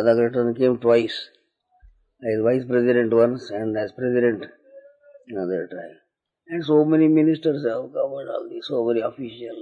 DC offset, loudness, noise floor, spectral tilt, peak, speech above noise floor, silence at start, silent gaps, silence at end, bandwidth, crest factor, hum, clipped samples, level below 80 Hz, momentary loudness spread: under 0.1%; -22 LUFS; -60 dBFS; -8 dB/octave; -6 dBFS; 39 dB; 0 s; none; 0 s; 7.4 kHz; 16 dB; none; under 0.1%; -64 dBFS; 15 LU